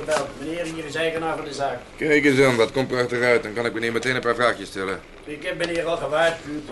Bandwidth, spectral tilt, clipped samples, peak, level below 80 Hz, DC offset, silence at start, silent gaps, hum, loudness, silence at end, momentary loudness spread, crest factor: 11.5 kHz; -4.5 dB/octave; under 0.1%; -6 dBFS; -50 dBFS; under 0.1%; 0 s; none; none; -22 LUFS; 0 s; 12 LU; 18 dB